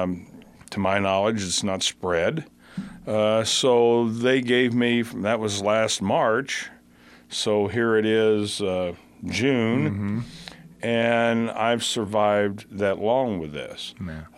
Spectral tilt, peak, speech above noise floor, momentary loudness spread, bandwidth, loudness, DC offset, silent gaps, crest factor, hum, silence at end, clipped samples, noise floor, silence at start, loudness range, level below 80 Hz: -4.5 dB/octave; -6 dBFS; 29 dB; 14 LU; 15.5 kHz; -23 LUFS; under 0.1%; none; 18 dB; none; 0.1 s; under 0.1%; -52 dBFS; 0 s; 3 LU; -58 dBFS